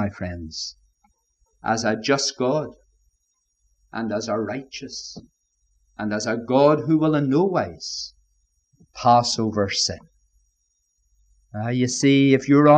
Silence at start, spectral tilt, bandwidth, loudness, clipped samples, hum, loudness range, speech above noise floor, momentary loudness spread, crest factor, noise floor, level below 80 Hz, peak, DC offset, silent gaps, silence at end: 0 s; -5 dB/octave; 9 kHz; -22 LUFS; under 0.1%; none; 8 LU; 51 dB; 16 LU; 20 dB; -72 dBFS; -56 dBFS; -4 dBFS; under 0.1%; none; 0 s